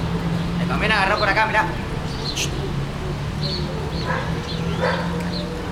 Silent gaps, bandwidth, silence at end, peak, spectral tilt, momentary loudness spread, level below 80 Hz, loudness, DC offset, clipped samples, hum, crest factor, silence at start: none; 15.5 kHz; 0 s; -4 dBFS; -5 dB/octave; 9 LU; -34 dBFS; -22 LUFS; under 0.1%; under 0.1%; none; 18 dB; 0 s